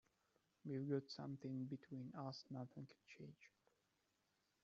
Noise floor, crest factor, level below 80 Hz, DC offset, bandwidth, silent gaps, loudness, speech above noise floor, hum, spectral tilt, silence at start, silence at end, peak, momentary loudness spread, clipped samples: -86 dBFS; 20 dB; -90 dBFS; under 0.1%; 7.4 kHz; none; -51 LUFS; 35 dB; none; -7 dB/octave; 0.65 s; 1.15 s; -32 dBFS; 15 LU; under 0.1%